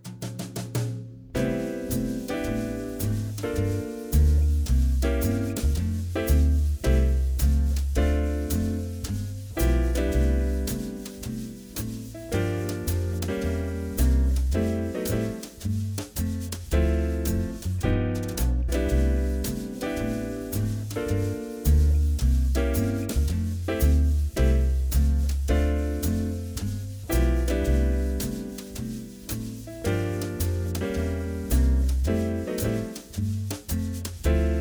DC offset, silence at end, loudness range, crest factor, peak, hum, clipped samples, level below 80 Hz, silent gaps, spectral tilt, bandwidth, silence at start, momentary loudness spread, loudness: under 0.1%; 0 s; 4 LU; 14 dB; -10 dBFS; none; under 0.1%; -26 dBFS; none; -6.5 dB/octave; over 20 kHz; 0.05 s; 10 LU; -27 LUFS